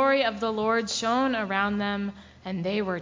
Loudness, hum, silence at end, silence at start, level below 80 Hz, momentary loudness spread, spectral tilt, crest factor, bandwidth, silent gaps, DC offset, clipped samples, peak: -27 LUFS; none; 0 s; 0 s; -56 dBFS; 9 LU; -4.5 dB/octave; 16 dB; 7.6 kHz; none; under 0.1%; under 0.1%; -10 dBFS